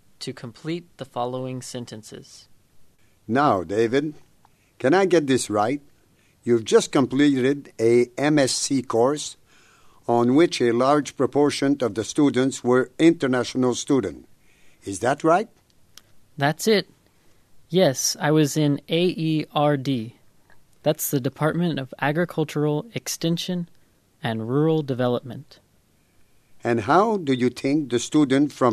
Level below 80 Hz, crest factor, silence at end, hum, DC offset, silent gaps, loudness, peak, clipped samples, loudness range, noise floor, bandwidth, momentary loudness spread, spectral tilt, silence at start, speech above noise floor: -64 dBFS; 18 dB; 0 s; none; under 0.1%; none; -22 LUFS; -4 dBFS; under 0.1%; 5 LU; -62 dBFS; 14 kHz; 14 LU; -5 dB/octave; 0.2 s; 40 dB